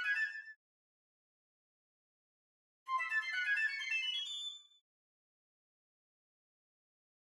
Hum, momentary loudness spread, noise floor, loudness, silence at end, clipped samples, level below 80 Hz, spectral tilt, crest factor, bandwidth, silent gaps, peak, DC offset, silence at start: none; 17 LU; under -90 dBFS; -36 LUFS; 2.7 s; under 0.1%; under -90 dBFS; 6 dB/octave; 18 dB; 12.5 kHz; 0.56-2.86 s; -26 dBFS; under 0.1%; 0 s